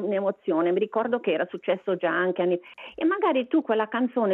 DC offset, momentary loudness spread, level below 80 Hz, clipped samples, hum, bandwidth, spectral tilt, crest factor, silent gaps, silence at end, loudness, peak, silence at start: under 0.1%; 4 LU; -74 dBFS; under 0.1%; none; 4.1 kHz; -9 dB/octave; 14 dB; none; 0 s; -25 LUFS; -12 dBFS; 0 s